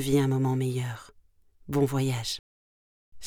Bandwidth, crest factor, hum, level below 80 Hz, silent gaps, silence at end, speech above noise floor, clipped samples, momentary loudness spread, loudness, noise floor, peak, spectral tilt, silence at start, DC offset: 18 kHz; 16 dB; none; -56 dBFS; 2.39-3.12 s; 0 s; 32 dB; under 0.1%; 12 LU; -28 LUFS; -59 dBFS; -12 dBFS; -6 dB/octave; 0 s; under 0.1%